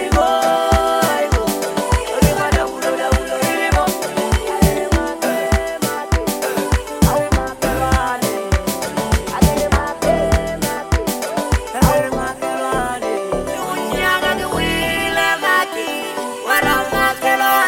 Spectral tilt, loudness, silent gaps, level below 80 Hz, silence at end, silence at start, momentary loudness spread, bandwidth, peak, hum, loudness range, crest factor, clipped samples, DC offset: -4.5 dB/octave; -17 LUFS; none; -26 dBFS; 0 s; 0 s; 6 LU; 17 kHz; 0 dBFS; none; 2 LU; 16 dB; under 0.1%; under 0.1%